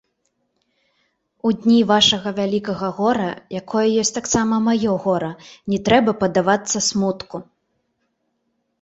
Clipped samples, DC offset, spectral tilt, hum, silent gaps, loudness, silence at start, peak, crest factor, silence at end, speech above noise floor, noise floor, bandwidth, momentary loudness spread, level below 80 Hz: under 0.1%; under 0.1%; -4 dB/octave; none; none; -18 LUFS; 1.45 s; -2 dBFS; 18 dB; 1.4 s; 52 dB; -71 dBFS; 8.2 kHz; 11 LU; -52 dBFS